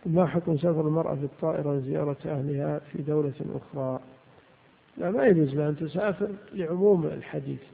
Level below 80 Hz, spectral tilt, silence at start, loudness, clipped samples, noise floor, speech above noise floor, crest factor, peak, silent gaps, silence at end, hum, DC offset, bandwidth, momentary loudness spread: -62 dBFS; -12.5 dB/octave; 0.05 s; -28 LUFS; under 0.1%; -59 dBFS; 32 dB; 20 dB; -8 dBFS; none; 0.1 s; none; under 0.1%; 4.6 kHz; 12 LU